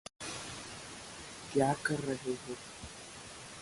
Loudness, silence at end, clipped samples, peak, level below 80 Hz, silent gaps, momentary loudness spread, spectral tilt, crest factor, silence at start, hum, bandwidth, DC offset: -38 LUFS; 0 s; under 0.1%; -16 dBFS; -64 dBFS; none; 15 LU; -4.5 dB/octave; 22 dB; 0.2 s; none; 11.5 kHz; under 0.1%